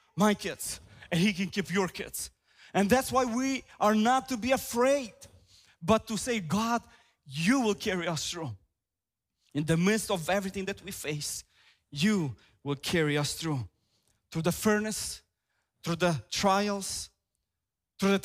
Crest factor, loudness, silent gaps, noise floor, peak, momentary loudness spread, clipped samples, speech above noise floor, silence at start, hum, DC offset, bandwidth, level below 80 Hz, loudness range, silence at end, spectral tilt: 20 dB; -30 LUFS; none; -90 dBFS; -10 dBFS; 12 LU; under 0.1%; 61 dB; 0.15 s; none; under 0.1%; 16 kHz; -58 dBFS; 4 LU; 0 s; -4.5 dB/octave